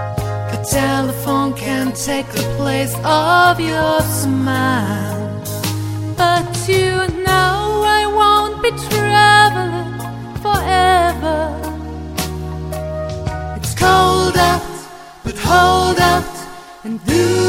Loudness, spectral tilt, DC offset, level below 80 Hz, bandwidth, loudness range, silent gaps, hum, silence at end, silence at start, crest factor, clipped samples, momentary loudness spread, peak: -15 LUFS; -4.5 dB/octave; under 0.1%; -32 dBFS; 16.5 kHz; 5 LU; none; none; 0 s; 0 s; 16 dB; under 0.1%; 14 LU; 0 dBFS